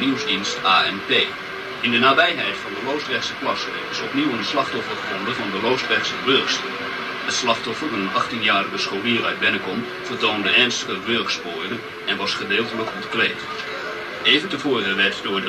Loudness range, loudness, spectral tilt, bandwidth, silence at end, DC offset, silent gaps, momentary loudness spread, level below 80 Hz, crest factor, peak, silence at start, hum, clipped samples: 4 LU; -20 LUFS; -3 dB/octave; 13.5 kHz; 0 s; under 0.1%; none; 10 LU; -60 dBFS; 20 dB; -2 dBFS; 0 s; none; under 0.1%